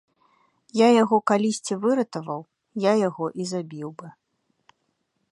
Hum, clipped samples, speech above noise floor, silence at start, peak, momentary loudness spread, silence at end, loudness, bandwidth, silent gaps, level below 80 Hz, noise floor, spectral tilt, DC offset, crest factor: none; under 0.1%; 52 dB; 0.75 s; -4 dBFS; 18 LU; 1.2 s; -23 LUFS; 11.5 kHz; none; -76 dBFS; -74 dBFS; -5.5 dB/octave; under 0.1%; 20 dB